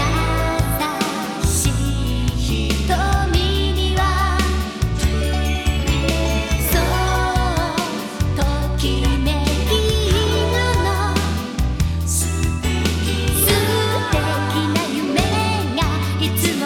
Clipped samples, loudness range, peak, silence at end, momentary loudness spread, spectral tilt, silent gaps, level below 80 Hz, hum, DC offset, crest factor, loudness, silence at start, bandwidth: under 0.1%; 1 LU; -2 dBFS; 0 s; 4 LU; -4.5 dB/octave; none; -22 dBFS; none; under 0.1%; 16 dB; -19 LUFS; 0 s; 18.5 kHz